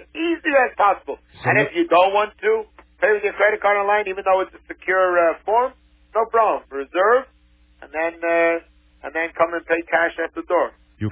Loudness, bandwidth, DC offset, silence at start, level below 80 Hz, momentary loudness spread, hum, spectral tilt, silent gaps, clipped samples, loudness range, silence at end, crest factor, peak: -20 LUFS; 4 kHz; under 0.1%; 0 s; -54 dBFS; 10 LU; none; -8.5 dB/octave; none; under 0.1%; 3 LU; 0 s; 18 dB; -4 dBFS